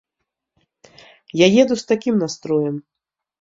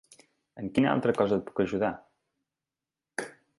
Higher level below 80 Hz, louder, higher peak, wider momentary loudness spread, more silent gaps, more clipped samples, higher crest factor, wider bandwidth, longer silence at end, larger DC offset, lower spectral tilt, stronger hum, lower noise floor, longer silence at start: about the same, -62 dBFS vs -62 dBFS; first, -18 LUFS vs -29 LUFS; first, -2 dBFS vs -10 dBFS; about the same, 13 LU vs 14 LU; neither; neither; about the same, 20 dB vs 22 dB; second, 7.8 kHz vs 11.5 kHz; first, 0.6 s vs 0.3 s; neither; second, -5 dB/octave vs -6.5 dB/octave; neither; second, -79 dBFS vs under -90 dBFS; first, 1.35 s vs 0.55 s